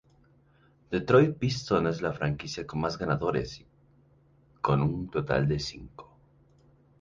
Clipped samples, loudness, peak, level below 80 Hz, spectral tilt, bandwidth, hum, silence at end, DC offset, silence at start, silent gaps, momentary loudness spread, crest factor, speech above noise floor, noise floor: under 0.1%; -28 LUFS; -10 dBFS; -52 dBFS; -6.5 dB/octave; 7.6 kHz; none; 0.95 s; under 0.1%; 0.9 s; none; 13 LU; 20 dB; 35 dB; -62 dBFS